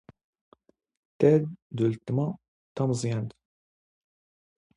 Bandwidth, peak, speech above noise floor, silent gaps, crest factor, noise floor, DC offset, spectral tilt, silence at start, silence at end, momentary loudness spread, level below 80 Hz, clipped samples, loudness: 11 kHz; -8 dBFS; over 64 dB; 1.62-1.70 s, 2.48-2.75 s; 22 dB; under -90 dBFS; under 0.1%; -7.5 dB/octave; 1.2 s; 1.45 s; 16 LU; -66 dBFS; under 0.1%; -27 LUFS